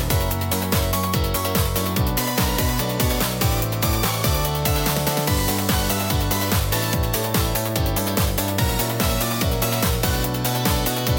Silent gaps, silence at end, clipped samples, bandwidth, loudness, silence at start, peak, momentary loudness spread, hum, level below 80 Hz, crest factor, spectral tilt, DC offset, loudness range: none; 0 s; under 0.1%; 17 kHz; -21 LUFS; 0 s; -6 dBFS; 1 LU; none; -30 dBFS; 16 dB; -4.5 dB/octave; under 0.1%; 1 LU